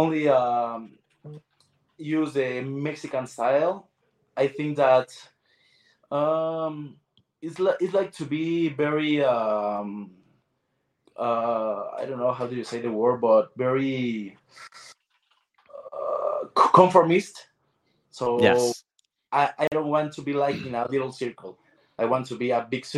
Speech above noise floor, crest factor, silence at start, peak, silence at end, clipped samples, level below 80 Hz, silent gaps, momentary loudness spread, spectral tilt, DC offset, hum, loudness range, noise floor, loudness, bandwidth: 51 dB; 24 dB; 0 s; -2 dBFS; 0 s; under 0.1%; -72 dBFS; none; 19 LU; -6 dB/octave; under 0.1%; none; 6 LU; -75 dBFS; -24 LUFS; 12.5 kHz